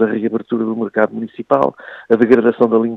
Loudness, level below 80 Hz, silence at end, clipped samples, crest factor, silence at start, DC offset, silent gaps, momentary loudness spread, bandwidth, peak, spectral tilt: -16 LUFS; -60 dBFS; 0 s; under 0.1%; 16 dB; 0 s; under 0.1%; none; 8 LU; 5.8 kHz; 0 dBFS; -9 dB/octave